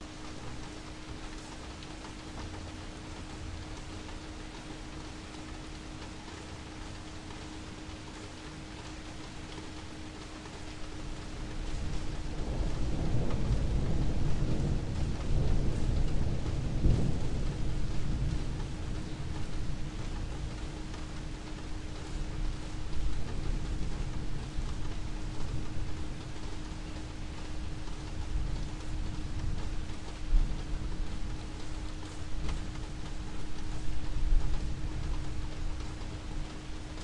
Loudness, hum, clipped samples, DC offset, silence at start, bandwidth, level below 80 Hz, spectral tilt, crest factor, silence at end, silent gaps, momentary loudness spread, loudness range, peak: -39 LUFS; none; under 0.1%; under 0.1%; 0 s; 11 kHz; -36 dBFS; -6 dB/octave; 20 dB; 0 s; none; 11 LU; 10 LU; -12 dBFS